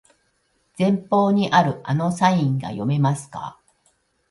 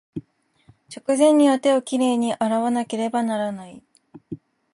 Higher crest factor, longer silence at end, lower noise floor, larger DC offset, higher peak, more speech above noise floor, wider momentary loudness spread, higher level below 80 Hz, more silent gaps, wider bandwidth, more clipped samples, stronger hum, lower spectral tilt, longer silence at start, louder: about the same, 18 dB vs 16 dB; first, 0.8 s vs 0.35 s; first, -67 dBFS vs -57 dBFS; neither; about the same, -4 dBFS vs -6 dBFS; first, 47 dB vs 37 dB; second, 11 LU vs 22 LU; first, -62 dBFS vs -68 dBFS; neither; about the same, 11.5 kHz vs 11.5 kHz; neither; neither; first, -6.5 dB/octave vs -4.5 dB/octave; first, 0.8 s vs 0.15 s; about the same, -20 LUFS vs -20 LUFS